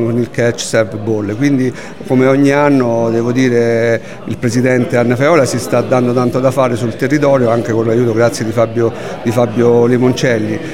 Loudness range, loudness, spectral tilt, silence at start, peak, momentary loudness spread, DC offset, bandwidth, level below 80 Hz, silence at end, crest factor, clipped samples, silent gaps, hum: 1 LU; -13 LUFS; -6.5 dB/octave; 0 s; 0 dBFS; 6 LU; 2%; 16 kHz; -50 dBFS; 0 s; 12 dB; under 0.1%; none; none